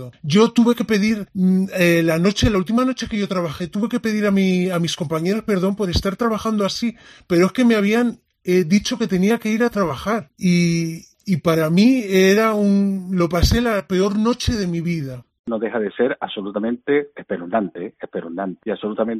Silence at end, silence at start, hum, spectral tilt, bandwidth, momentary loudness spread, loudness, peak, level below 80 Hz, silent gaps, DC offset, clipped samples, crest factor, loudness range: 0 s; 0 s; none; -6 dB/octave; 14 kHz; 11 LU; -19 LUFS; -2 dBFS; -38 dBFS; 15.39-15.44 s; under 0.1%; under 0.1%; 16 dB; 6 LU